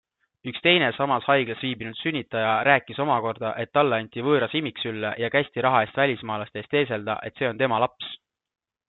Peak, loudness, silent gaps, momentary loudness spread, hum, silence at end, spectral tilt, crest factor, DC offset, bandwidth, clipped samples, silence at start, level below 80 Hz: -4 dBFS; -24 LUFS; none; 10 LU; none; 0.75 s; -9 dB/octave; 22 dB; under 0.1%; 4.3 kHz; under 0.1%; 0.45 s; -68 dBFS